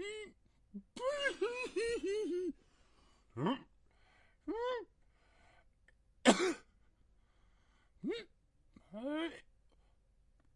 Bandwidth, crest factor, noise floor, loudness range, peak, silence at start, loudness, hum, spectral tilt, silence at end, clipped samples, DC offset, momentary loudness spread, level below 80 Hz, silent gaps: 11.5 kHz; 30 dB; -70 dBFS; 9 LU; -10 dBFS; 0 s; -38 LUFS; none; -4 dB/octave; 1.15 s; under 0.1%; under 0.1%; 22 LU; -68 dBFS; none